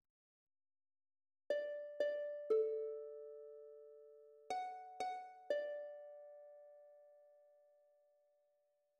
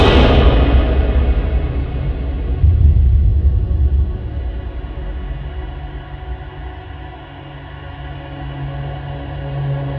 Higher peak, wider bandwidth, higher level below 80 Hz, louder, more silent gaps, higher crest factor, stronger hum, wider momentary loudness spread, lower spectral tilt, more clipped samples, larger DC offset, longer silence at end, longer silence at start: second, -26 dBFS vs 0 dBFS; first, 9 kHz vs 5.6 kHz; second, under -90 dBFS vs -18 dBFS; second, -44 LUFS vs -17 LUFS; neither; about the same, 20 dB vs 16 dB; neither; first, 23 LU vs 19 LU; second, -2.5 dB/octave vs -8.5 dB/octave; neither; neither; first, 1.6 s vs 0 s; first, 1.5 s vs 0 s